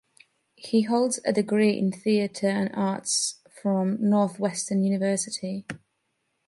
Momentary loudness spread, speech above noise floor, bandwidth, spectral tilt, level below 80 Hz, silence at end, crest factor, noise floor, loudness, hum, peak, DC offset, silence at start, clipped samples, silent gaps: 9 LU; 51 dB; 11.5 kHz; -5 dB/octave; -72 dBFS; 0.7 s; 16 dB; -76 dBFS; -25 LUFS; none; -10 dBFS; under 0.1%; 0.6 s; under 0.1%; none